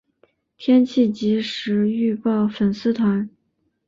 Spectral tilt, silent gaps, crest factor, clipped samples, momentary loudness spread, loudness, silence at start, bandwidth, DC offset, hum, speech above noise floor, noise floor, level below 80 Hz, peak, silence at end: -7.5 dB/octave; none; 14 dB; under 0.1%; 6 LU; -20 LUFS; 0.6 s; 7.4 kHz; under 0.1%; none; 51 dB; -70 dBFS; -60 dBFS; -6 dBFS; 0.6 s